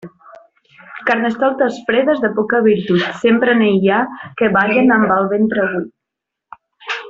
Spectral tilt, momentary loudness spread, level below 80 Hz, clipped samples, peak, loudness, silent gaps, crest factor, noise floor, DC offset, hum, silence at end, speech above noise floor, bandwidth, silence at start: -7 dB/octave; 11 LU; -56 dBFS; under 0.1%; -2 dBFS; -15 LUFS; none; 14 dB; -81 dBFS; under 0.1%; none; 0 s; 66 dB; 7.6 kHz; 0.05 s